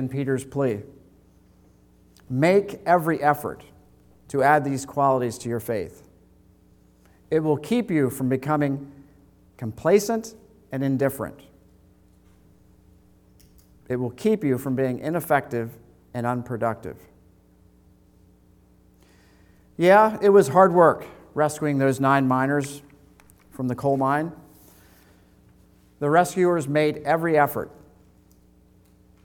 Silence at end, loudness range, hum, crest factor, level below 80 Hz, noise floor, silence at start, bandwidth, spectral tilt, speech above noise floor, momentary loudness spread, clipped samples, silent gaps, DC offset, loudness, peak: 1.55 s; 12 LU; none; 22 dB; -60 dBFS; -56 dBFS; 0 s; 19 kHz; -6.5 dB/octave; 35 dB; 17 LU; under 0.1%; none; under 0.1%; -22 LUFS; -2 dBFS